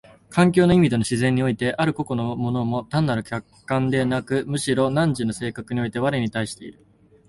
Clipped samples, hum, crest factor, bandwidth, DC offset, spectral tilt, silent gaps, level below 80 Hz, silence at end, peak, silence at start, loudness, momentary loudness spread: under 0.1%; none; 20 dB; 11.5 kHz; under 0.1%; -6.5 dB/octave; none; -50 dBFS; 0.55 s; -2 dBFS; 0.3 s; -22 LUFS; 11 LU